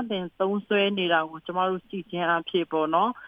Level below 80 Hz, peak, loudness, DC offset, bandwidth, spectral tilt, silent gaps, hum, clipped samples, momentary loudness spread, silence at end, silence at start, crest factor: -70 dBFS; -10 dBFS; -26 LUFS; under 0.1%; 5 kHz; -8 dB/octave; none; none; under 0.1%; 8 LU; 0 s; 0 s; 16 dB